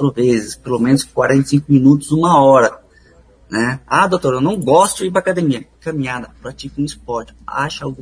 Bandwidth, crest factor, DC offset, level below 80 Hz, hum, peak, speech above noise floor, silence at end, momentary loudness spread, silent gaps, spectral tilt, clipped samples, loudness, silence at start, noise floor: 11 kHz; 16 dB; under 0.1%; -46 dBFS; none; 0 dBFS; 33 dB; 0 s; 14 LU; none; -6 dB/octave; under 0.1%; -15 LUFS; 0 s; -47 dBFS